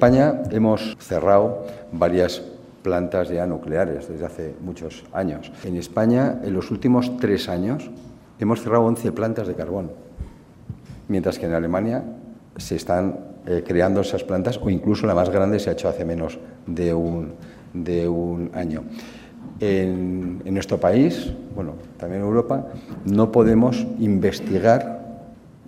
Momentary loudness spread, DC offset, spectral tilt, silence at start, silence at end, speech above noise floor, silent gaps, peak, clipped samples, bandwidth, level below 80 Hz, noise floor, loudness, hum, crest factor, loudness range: 17 LU; under 0.1%; -7.5 dB/octave; 0 s; 0.15 s; 22 dB; none; 0 dBFS; under 0.1%; 15.5 kHz; -48 dBFS; -43 dBFS; -22 LUFS; none; 22 dB; 6 LU